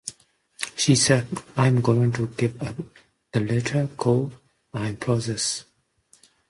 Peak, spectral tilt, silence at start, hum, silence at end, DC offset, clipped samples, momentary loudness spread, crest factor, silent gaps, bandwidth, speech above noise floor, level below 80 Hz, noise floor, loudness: -6 dBFS; -5 dB/octave; 0.05 s; none; 0.85 s; under 0.1%; under 0.1%; 14 LU; 20 dB; none; 11.5 kHz; 38 dB; -56 dBFS; -61 dBFS; -24 LUFS